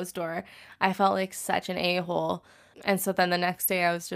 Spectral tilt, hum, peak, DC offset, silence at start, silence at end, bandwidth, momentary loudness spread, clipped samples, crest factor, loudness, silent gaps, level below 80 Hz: -4 dB/octave; none; -6 dBFS; under 0.1%; 0 s; 0 s; 15.5 kHz; 9 LU; under 0.1%; 22 dB; -27 LUFS; none; -68 dBFS